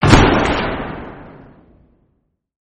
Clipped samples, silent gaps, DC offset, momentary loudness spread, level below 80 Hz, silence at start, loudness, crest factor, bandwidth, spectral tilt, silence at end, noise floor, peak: under 0.1%; none; under 0.1%; 24 LU; -26 dBFS; 0 s; -15 LUFS; 18 dB; 9 kHz; -5.5 dB/octave; 1.45 s; -66 dBFS; 0 dBFS